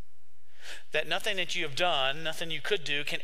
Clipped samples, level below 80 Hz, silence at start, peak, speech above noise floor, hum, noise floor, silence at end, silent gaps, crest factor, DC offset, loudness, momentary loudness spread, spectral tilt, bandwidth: under 0.1%; -64 dBFS; 0.6 s; -12 dBFS; 37 dB; none; -69 dBFS; 0 s; none; 20 dB; 3%; -30 LUFS; 13 LU; -2.5 dB/octave; 16 kHz